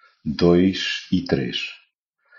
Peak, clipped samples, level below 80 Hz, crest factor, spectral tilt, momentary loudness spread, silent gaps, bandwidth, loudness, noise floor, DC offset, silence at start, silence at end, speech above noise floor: -4 dBFS; under 0.1%; -48 dBFS; 18 dB; -5 dB/octave; 12 LU; none; 7.2 kHz; -21 LUFS; -66 dBFS; under 0.1%; 0.25 s; 0.65 s; 46 dB